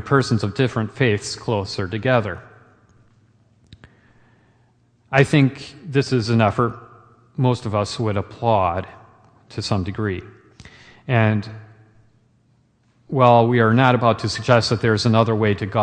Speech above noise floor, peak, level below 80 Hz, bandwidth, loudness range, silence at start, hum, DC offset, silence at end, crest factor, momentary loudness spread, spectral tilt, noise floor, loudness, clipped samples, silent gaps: 41 dB; 0 dBFS; -52 dBFS; 9.8 kHz; 9 LU; 0 s; none; under 0.1%; 0 s; 20 dB; 14 LU; -6.5 dB/octave; -60 dBFS; -19 LUFS; under 0.1%; none